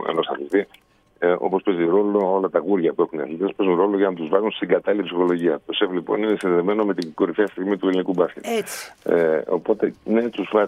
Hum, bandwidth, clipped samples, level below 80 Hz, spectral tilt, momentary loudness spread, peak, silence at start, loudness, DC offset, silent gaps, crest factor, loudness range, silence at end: none; 15 kHz; under 0.1%; -68 dBFS; -6 dB/octave; 5 LU; -2 dBFS; 0 s; -21 LUFS; under 0.1%; none; 18 dB; 2 LU; 0 s